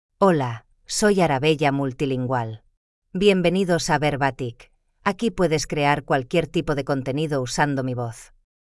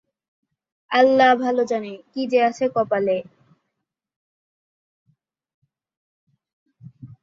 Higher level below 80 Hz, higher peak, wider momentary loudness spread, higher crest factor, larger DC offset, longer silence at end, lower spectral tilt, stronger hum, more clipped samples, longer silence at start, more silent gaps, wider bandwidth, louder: first, -48 dBFS vs -70 dBFS; second, -6 dBFS vs -2 dBFS; about the same, 12 LU vs 12 LU; second, 16 dB vs 22 dB; neither; first, 0.4 s vs 0.15 s; about the same, -5 dB/octave vs -5 dB/octave; neither; neither; second, 0.2 s vs 0.9 s; second, 2.77-3.02 s vs 4.16-5.06 s, 5.54-5.62 s, 5.97-6.27 s, 6.53-6.66 s; first, 12 kHz vs 7.6 kHz; about the same, -22 LUFS vs -20 LUFS